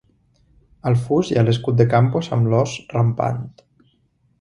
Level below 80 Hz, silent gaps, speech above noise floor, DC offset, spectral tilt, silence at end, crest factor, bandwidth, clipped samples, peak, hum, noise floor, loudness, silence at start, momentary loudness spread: -50 dBFS; none; 45 dB; under 0.1%; -7.5 dB/octave; 0.9 s; 18 dB; 10.5 kHz; under 0.1%; 0 dBFS; none; -63 dBFS; -19 LUFS; 0.85 s; 8 LU